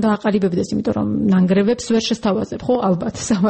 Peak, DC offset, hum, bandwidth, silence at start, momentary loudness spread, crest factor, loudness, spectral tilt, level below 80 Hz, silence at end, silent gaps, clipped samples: -6 dBFS; under 0.1%; none; 8.8 kHz; 0 s; 5 LU; 10 dB; -18 LUFS; -6 dB/octave; -48 dBFS; 0 s; none; under 0.1%